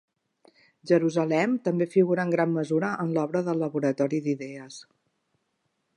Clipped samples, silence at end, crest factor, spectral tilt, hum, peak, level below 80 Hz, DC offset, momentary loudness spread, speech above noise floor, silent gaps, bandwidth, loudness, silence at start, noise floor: under 0.1%; 1.15 s; 18 dB; -7.5 dB/octave; none; -8 dBFS; -80 dBFS; under 0.1%; 10 LU; 51 dB; none; 11 kHz; -26 LUFS; 0.85 s; -76 dBFS